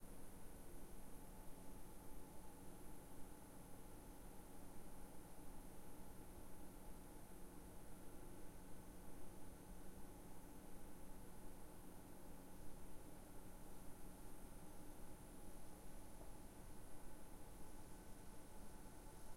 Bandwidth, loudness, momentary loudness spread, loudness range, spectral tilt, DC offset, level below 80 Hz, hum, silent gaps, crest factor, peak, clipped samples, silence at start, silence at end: 16 kHz; -61 LUFS; 1 LU; 0 LU; -5 dB/octave; under 0.1%; -62 dBFS; none; none; 12 dB; -40 dBFS; under 0.1%; 0 s; 0 s